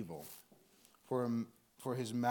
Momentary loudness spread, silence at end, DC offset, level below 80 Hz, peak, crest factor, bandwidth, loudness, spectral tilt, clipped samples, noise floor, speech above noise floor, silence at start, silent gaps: 14 LU; 0 s; under 0.1%; -80 dBFS; -20 dBFS; 20 dB; 19 kHz; -41 LUFS; -6 dB/octave; under 0.1%; -67 dBFS; 29 dB; 0 s; none